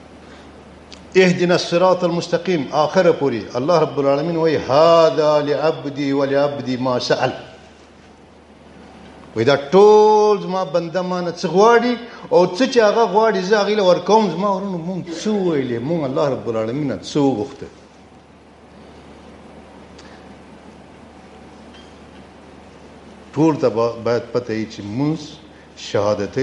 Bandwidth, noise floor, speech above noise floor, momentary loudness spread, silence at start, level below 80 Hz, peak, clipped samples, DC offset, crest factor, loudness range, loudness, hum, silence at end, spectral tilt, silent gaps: 9.2 kHz; -45 dBFS; 29 dB; 11 LU; 0.2 s; -54 dBFS; 0 dBFS; under 0.1%; under 0.1%; 18 dB; 9 LU; -17 LUFS; none; 0 s; -6 dB/octave; none